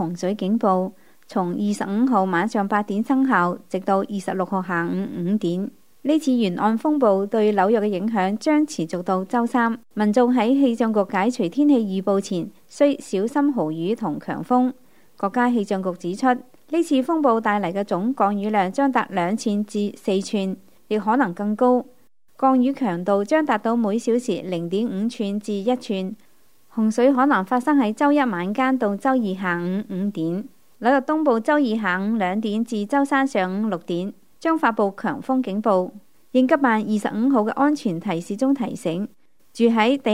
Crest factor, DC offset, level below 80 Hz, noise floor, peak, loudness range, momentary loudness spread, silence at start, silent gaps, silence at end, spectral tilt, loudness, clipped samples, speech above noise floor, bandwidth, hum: 18 dB; 0.3%; -72 dBFS; -58 dBFS; -4 dBFS; 3 LU; 8 LU; 0 s; none; 0 s; -6.5 dB/octave; -21 LUFS; under 0.1%; 38 dB; 15.5 kHz; none